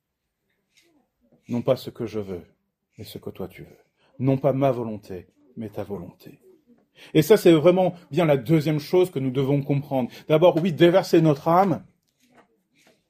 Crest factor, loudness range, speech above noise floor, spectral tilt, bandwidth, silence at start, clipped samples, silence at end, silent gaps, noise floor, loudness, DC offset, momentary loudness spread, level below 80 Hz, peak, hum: 18 dB; 12 LU; 57 dB; -7 dB/octave; 15.5 kHz; 1.5 s; under 0.1%; 1.3 s; none; -78 dBFS; -21 LUFS; under 0.1%; 21 LU; -62 dBFS; -4 dBFS; none